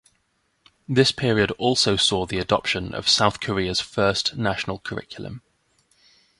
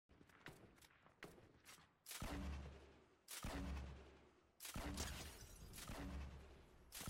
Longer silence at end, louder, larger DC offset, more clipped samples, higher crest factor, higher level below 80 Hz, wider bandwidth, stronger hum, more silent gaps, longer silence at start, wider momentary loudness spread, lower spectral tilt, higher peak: first, 1 s vs 0 s; first, -21 LUFS vs -54 LUFS; neither; neither; about the same, 22 dB vs 22 dB; first, -48 dBFS vs -58 dBFS; second, 11.5 kHz vs 16.5 kHz; neither; neither; first, 0.9 s vs 0.1 s; second, 14 LU vs 17 LU; about the same, -4 dB/octave vs -4 dB/octave; first, -2 dBFS vs -34 dBFS